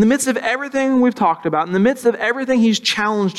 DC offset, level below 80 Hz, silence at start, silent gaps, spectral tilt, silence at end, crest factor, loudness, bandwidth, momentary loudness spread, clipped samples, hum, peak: under 0.1%; -58 dBFS; 0 s; none; -4.5 dB/octave; 0 s; 12 dB; -17 LUFS; 14 kHz; 4 LU; under 0.1%; none; -4 dBFS